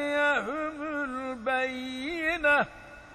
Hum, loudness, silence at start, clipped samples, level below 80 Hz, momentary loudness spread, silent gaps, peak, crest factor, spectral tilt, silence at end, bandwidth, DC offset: none; -28 LUFS; 0 s; under 0.1%; -58 dBFS; 10 LU; none; -14 dBFS; 16 dB; -4 dB/octave; 0 s; 12.5 kHz; under 0.1%